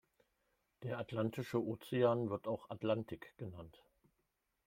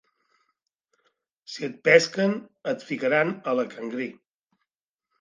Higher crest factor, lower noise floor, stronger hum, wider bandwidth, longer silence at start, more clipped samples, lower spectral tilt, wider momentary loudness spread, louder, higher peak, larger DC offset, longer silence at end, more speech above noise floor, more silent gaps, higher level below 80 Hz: about the same, 20 dB vs 24 dB; about the same, -85 dBFS vs -85 dBFS; neither; first, 16.5 kHz vs 9.6 kHz; second, 0.8 s vs 1.5 s; neither; first, -7.5 dB/octave vs -4.5 dB/octave; about the same, 16 LU vs 16 LU; second, -39 LUFS vs -24 LUFS; second, -22 dBFS vs -4 dBFS; neither; second, 0.95 s vs 1.1 s; second, 45 dB vs 61 dB; neither; about the same, -76 dBFS vs -80 dBFS